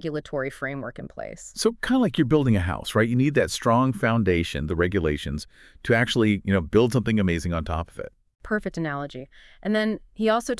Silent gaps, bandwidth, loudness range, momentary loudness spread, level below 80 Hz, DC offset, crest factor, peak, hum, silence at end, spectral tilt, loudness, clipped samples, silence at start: none; 12 kHz; 4 LU; 15 LU; -44 dBFS; under 0.1%; 18 dB; -6 dBFS; none; 0 s; -6 dB/octave; -24 LUFS; under 0.1%; 0.05 s